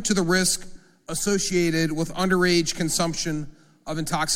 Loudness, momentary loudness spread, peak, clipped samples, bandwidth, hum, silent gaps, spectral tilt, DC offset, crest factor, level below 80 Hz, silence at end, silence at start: -23 LUFS; 12 LU; -8 dBFS; under 0.1%; 17 kHz; none; none; -3.5 dB/octave; under 0.1%; 16 dB; -44 dBFS; 0 s; 0 s